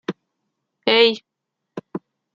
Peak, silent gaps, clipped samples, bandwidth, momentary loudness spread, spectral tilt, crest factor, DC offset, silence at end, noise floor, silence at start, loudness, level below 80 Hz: 0 dBFS; none; under 0.1%; 7.4 kHz; 23 LU; -4.5 dB/octave; 22 dB; under 0.1%; 0.35 s; -81 dBFS; 0.1 s; -17 LUFS; -72 dBFS